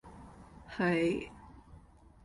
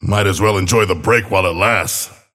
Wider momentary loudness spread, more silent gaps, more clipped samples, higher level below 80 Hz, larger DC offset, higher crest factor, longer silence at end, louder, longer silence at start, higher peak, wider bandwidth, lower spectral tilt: first, 25 LU vs 3 LU; neither; neither; second, -58 dBFS vs -40 dBFS; neither; about the same, 18 dB vs 16 dB; first, 0.45 s vs 0.25 s; second, -32 LUFS vs -15 LUFS; about the same, 0.05 s vs 0 s; second, -18 dBFS vs 0 dBFS; second, 11 kHz vs 16 kHz; first, -6.5 dB/octave vs -4 dB/octave